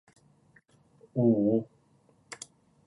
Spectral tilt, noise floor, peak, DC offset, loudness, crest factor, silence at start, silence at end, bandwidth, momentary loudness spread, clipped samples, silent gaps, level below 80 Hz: -8 dB/octave; -65 dBFS; -12 dBFS; under 0.1%; -27 LUFS; 20 dB; 1.15 s; 0.5 s; 11 kHz; 23 LU; under 0.1%; none; -72 dBFS